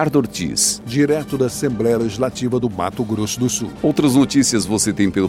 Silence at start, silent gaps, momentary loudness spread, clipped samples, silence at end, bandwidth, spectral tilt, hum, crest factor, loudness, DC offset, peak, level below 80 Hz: 0 s; none; 6 LU; under 0.1%; 0 s; 16.5 kHz; -4.5 dB/octave; none; 16 dB; -18 LUFS; under 0.1%; -2 dBFS; -46 dBFS